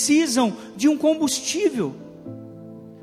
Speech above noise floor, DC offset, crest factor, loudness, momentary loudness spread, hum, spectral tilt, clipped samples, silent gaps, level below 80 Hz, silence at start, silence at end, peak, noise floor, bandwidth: 20 dB; under 0.1%; 14 dB; -21 LUFS; 21 LU; none; -3.5 dB/octave; under 0.1%; none; -64 dBFS; 0 s; 0.05 s; -8 dBFS; -40 dBFS; 15 kHz